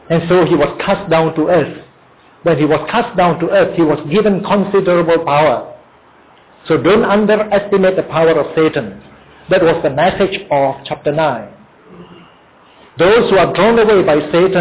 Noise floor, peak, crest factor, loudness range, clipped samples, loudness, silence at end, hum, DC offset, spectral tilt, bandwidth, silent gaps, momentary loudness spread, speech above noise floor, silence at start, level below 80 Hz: -46 dBFS; 0 dBFS; 12 dB; 3 LU; under 0.1%; -13 LUFS; 0 s; none; under 0.1%; -10.5 dB/octave; 4 kHz; none; 7 LU; 34 dB; 0.1 s; -44 dBFS